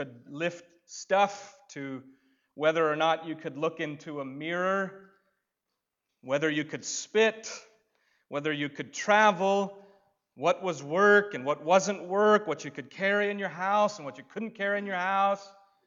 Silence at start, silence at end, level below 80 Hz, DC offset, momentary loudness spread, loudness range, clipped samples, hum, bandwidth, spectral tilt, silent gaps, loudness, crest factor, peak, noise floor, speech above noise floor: 0 s; 0.35 s; -86 dBFS; under 0.1%; 17 LU; 6 LU; under 0.1%; none; 7.8 kHz; -4 dB/octave; none; -28 LUFS; 22 dB; -8 dBFS; -85 dBFS; 57 dB